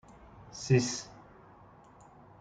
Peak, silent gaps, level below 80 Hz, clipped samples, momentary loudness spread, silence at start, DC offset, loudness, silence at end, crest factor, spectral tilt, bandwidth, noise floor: -14 dBFS; none; -62 dBFS; under 0.1%; 26 LU; 0.35 s; under 0.1%; -31 LUFS; 1.2 s; 22 dB; -5 dB/octave; 9.4 kHz; -56 dBFS